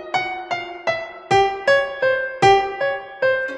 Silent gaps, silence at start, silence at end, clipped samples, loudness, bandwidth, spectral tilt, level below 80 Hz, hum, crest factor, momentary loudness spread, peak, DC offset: none; 0 s; 0 s; under 0.1%; -19 LUFS; 10.5 kHz; -4 dB/octave; -52 dBFS; none; 18 dB; 10 LU; -2 dBFS; under 0.1%